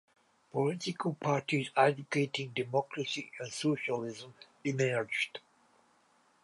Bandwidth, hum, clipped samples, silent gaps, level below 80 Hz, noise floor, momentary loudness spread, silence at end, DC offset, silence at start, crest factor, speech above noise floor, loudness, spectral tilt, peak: 11.5 kHz; none; under 0.1%; none; -80 dBFS; -69 dBFS; 11 LU; 1.05 s; under 0.1%; 0.55 s; 22 dB; 36 dB; -33 LUFS; -5 dB/octave; -12 dBFS